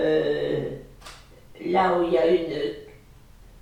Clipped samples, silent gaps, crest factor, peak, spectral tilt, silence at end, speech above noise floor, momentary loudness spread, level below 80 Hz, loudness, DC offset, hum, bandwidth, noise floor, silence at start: under 0.1%; none; 16 dB; -8 dBFS; -6.5 dB/octave; 0.7 s; 28 dB; 22 LU; -50 dBFS; -24 LUFS; 0.1%; none; 11.5 kHz; -50 dBFS; 0 s